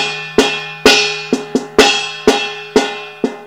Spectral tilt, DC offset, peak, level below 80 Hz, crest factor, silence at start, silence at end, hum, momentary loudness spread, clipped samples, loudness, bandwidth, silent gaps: -2 dB/octave; under 0.1%; 0 dBFS; -44 dBFS; 14 dB; 0 s; 0 s; none; 9 LU; 0.5%; -13 LUFS; 17 kHz; none